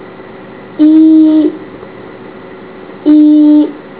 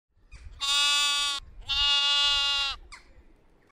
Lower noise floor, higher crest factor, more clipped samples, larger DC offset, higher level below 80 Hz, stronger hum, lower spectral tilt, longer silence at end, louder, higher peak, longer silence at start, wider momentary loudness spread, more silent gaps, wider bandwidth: second, -30 dBFS vs -58 dBFS; second, 10 dB vs 18 dB; first, 0.7% vs under 0.1%; first, 0.4% vs under 0.1%; second, -54 dBFS vs -48 dBFS; neither; first, -11 dB/octave vs 2 dB/octave; second, 0.2 s vs 0.75 s; first, -7 LUFS vs -23 LUFS; first, 0 dBFS vs -10 dBFS; second, 0 s vs 0.35 s; first, 25 LU vs 11 LU; neither; second, 4 kHz vs 16 kHz